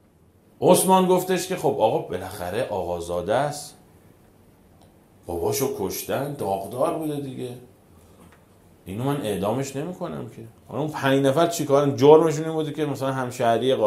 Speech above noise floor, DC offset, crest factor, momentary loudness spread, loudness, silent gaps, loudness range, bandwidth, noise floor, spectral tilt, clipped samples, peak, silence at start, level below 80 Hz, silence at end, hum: 34 dB; under 0.1%; 24 dB; 16 LU; -23 LUFS; none; 9 LU; 16 kHz; -56 dBFS; -5.5 dB/octave; under 0.1%; 0 dBFS; 0.6 s; -62 dBFS; 0 s; none